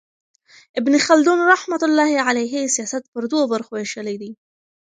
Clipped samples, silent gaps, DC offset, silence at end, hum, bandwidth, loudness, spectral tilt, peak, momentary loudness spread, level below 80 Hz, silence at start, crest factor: under 0.1%; 3.08-3.12 s; under 0.1%; 0.6 s; none; 9.6 kHz; -18 LUFS; -2.5 dB/octave; 0 dBFS; 14 LU; -72 dBFS; 0.75 s; 20 dB